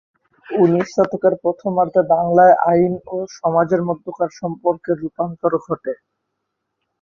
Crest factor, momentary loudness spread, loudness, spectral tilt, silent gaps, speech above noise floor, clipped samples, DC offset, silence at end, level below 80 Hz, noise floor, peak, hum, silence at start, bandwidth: 16 dB; 13 LU; -18 LUFS; -8 dB/octave; none; 59 dB; under 0.1%; under 0.1%; 1.05 s; -58 dBFS; -76 dBFS; -2 dBFS; none; 0.5 s; 7.2 kHz